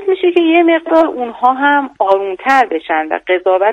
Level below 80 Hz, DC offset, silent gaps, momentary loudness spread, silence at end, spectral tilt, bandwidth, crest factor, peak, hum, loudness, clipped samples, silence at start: -58 dBFS; under 0.1%; none; 6 LU; 0 s; -4 dB/octave; 8.2 kHz; 12 dB; 0 dBFS; none; -13 LUFS; 0.3%; 0 s